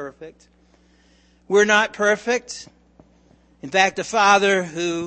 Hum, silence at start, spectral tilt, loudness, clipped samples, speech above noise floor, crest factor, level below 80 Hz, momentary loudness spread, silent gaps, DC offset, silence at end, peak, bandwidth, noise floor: none; 0 s; -3 dB/octave; -18 LUFS; under 0.1%; 37 dB; 20 dB; -60 dBFS; 20 LU; none; under 0.1%; 0 s; -2 dBFS; 8.8 kHz; -56 dBFS